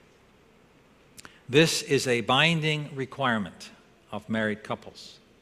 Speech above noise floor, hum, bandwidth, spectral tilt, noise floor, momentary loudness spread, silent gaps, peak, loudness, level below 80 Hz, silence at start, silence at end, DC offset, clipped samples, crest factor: 32 dB; none; 14.5 kHz; -4 dB/octave; -58 dBFS; 24 LU; none; -6 dBFS; -25 LUFS; -62 dBFS; 1.5 s; 0.3 s; under 0.1%; under 0.1%; 22 dB